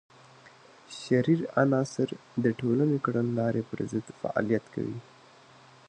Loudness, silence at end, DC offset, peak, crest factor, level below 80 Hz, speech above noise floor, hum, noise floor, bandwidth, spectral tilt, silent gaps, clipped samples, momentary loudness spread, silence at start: -29 LUFS; 0.85 s; under 0.1%; -10 dBFS; 20 dB; -68 dBFS; 27 dB; none; -55 dBFS; 9.8 kHz; -7.5 dB/octave; none; under 0.1%; 10 LU; 0.9 s